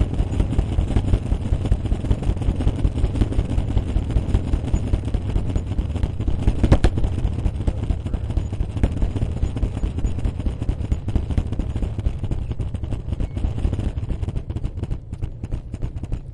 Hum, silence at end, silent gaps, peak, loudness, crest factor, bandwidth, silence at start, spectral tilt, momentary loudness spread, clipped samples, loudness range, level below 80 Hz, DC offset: none; 0 s; none; 0 dBFS; -25 LUFS; 20 dB; 10.5 kHz; 0 s; -8 dB/octave; 7 LU; under 0.1%; 4 LU; -24 dBFS; under 0.1%